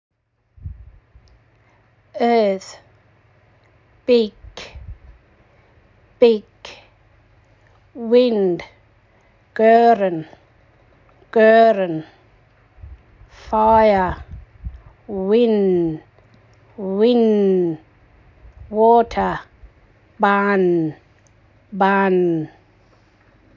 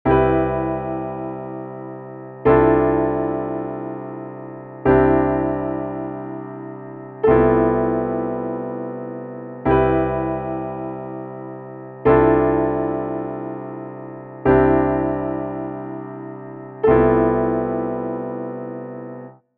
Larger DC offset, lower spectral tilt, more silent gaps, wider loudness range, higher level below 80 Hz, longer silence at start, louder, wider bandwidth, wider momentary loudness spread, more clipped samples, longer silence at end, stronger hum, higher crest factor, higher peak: neither; about the same, -7.5 dB/octave vs -8 dB/octave; neither; first, 7 LU vs 3 LU; second, -46 dBFS vs -38 dBFS; first, 0.65 s vs 0.05 s; first, -17 LUFS vs -20 LUFS; first, 7.4 kHz vs 4 kHz; first, 25 LU vs 18 LU; neither; first, 1.1 s vs 0.25 s; neither; about the same, 18 dB vs 18 dB; about the same, -2 dBFS vs -2 dBFS